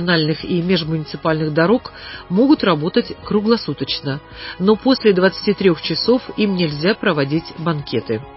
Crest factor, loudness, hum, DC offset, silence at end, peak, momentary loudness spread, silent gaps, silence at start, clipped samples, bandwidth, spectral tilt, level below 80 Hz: 16 dB; -18 LUFS; none; under 0.1%; 0 s; -2 dBFS; 8 LU; none; 0 s; under 0.1%; 5.8 kHz; -10 dB/octave; -46 dBFS